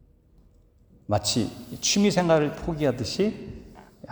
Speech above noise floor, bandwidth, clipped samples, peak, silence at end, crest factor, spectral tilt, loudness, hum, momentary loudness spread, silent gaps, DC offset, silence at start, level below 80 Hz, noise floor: 33 dB; over 20 kHz; under 0.1%; -8 dBFS; 0 s; 18 dB; -4.5 dB/octave; -25 LUFS; none; 19 LU; none; under 0.1%; 1.1 s; -50 dBFS; -57 dBFS